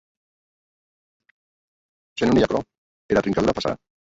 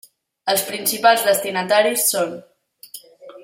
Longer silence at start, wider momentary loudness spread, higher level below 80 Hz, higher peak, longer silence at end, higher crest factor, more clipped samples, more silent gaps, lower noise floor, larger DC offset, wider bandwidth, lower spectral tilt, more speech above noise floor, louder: first, 2.15 s vs 0.45 s; second, 9 LU vs 23 LU; first, -48 dBFS vs -70 dBFS; about the same, -4 dBFS vs -2 dBFS; first, 0.3 s vs 0 s; about the same, 20 dB vs 18 dB; neither; first, 2.78-3.09 s vs none; first, under -90 dBFS vs -42 dBFS; neither; second, 8 kHz vs 16.5 kHz; first, -6 dB/octave vs -1.5 dB/octave; first, over 70 dB vs 24 dB; second, -22 LUFS vs -18 LUFS